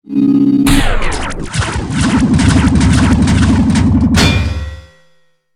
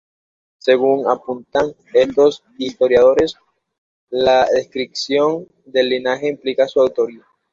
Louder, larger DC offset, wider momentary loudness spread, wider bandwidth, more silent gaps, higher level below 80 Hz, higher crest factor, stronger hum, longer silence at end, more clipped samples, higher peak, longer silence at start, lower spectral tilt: first, -12 LUFS vs -17 LUFS; neither; about the same, 9 LU vs 10 LU; first, 15.5 kHz vs 7.6 kHz; second, none vs 3.78-4.07 s; first, -20 dBFS vs -54 dBFS; about the same, 12 dB vs 16 dB; neither; first, 0.75 s vs 0.35 s; neither; about the same, 0 dBFS vs -2 dBFS; second, 0.1 s vs 0.65 s; about the same, -5.5 dB/octave vs -4.5 dB/octave